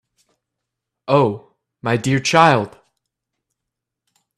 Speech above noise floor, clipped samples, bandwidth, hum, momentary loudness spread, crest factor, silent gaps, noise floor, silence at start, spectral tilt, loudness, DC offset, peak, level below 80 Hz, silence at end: 66 dB; under 0.1%; 13.5 kHz; none; 19 LU; 20 dB; none; -82 dBFS; 1.1 s; -5 dB/octave; -17 LUFS; under 0.1%; 0 dBFS; -58 dBFS; 1.7 s